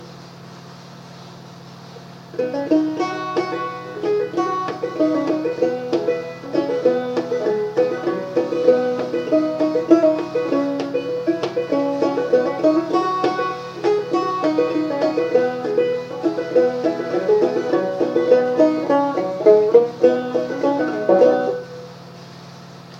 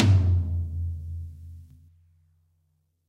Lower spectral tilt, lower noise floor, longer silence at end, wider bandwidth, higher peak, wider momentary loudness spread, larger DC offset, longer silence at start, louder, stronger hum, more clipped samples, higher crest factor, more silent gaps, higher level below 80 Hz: about the same, -6.5 dB/octave vs -7.5 dB/octave; second, -39 dBFS vs -71 dBFS; second, 0 s vs 1.45 s; first, 7.8 kHz vs 7 kHz; first, 0 dBFS vs -6 dBFS; about the same, 23 LU vs 24 LU; neither; about the same, 0 s vs 0 s; first, -19 LUFS vs -27 LUFS; neither; neither; about the same, 20 dB vs 20 dB; neither; second, -70 dBFS vs -40 dBFS